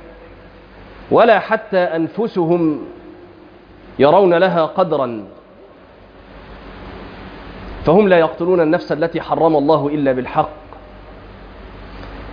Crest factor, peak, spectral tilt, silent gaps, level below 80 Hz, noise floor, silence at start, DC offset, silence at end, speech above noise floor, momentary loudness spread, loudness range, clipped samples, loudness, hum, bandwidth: 16 dB; 0 dBFS; -9 dB/octave; none; -42 dBFS; -43 dBFS; 0.05 s; under 0.1%; 0 s; 28 dB; 24 LU; 4 LU; under 0.1%; -15 LUFS; none; 5.2 kHz